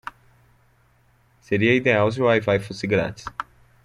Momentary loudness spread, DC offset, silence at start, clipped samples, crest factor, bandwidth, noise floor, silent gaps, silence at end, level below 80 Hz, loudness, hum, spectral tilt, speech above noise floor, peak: 17 LU; under 0.1%; 1.5 s; under 0.1%; 20 dB; 11.5 kHz; -60 dBFS; none; 0.4 s; -54 dBFS; -21 LUFS; none; -6.5 dB/octave; 39 dB; -4 dBFS